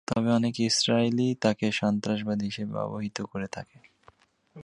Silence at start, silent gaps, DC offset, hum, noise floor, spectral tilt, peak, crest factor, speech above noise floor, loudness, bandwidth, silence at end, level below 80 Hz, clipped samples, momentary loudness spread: 0.1 s; none; under 0.1%; none; -60 dBFS; -5 dB/octave; -8 dBFS; 20 dB; 33 dB; -27 LUFS; 11.5 kHz; 0 s; -62 dBFS; under 0.1%; 11 LU